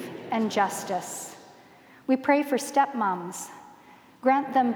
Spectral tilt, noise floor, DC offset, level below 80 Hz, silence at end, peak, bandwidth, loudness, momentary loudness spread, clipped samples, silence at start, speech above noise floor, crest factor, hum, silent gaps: -4 dB/octave; -53 dBFS; under 0.1%; -78 dBFS; 0 s; -8 dBFS; 20 kHz; -26 LUFS; 15 LU; under 0.1%; 0 s; 28 dB; 18 dB; none; none